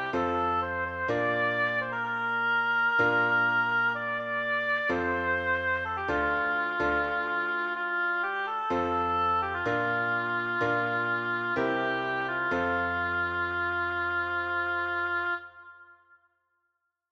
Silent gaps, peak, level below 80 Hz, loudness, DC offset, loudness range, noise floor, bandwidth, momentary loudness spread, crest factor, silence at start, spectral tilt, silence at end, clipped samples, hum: none; -14 dBFS; -56 dBFS; -28 LUFS; under 0.1%; 3 LU; -80 dBFS; 7.4 kHz; 5 LU; 14 dB; 0 s; -6 dB/octave; 1.2 s; under 0.1%; none